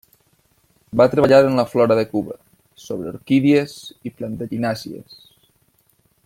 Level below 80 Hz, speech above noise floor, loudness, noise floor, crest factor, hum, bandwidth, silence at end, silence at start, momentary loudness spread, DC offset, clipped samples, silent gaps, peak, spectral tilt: -56 dBFS; 43 dB; -18 LUFS; -61 dBFS; 18 dB; none; 16 kHz; 1.25 s; 0.95 s; 20 LU; under 0.1%; under 0.1%; none; -2 dBFS; -7 dB/octave